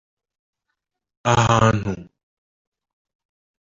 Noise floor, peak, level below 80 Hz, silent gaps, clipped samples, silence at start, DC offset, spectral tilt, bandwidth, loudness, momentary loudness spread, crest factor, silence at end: -80 dBFS; -2 dBFS; -44 dBFS; none; under 0.1%; 1.25 s; under 0.1%; -5.5 dB/octave; 7.8 kHz; -18 LUFS; 14 LU; 22 dB; 1.6 s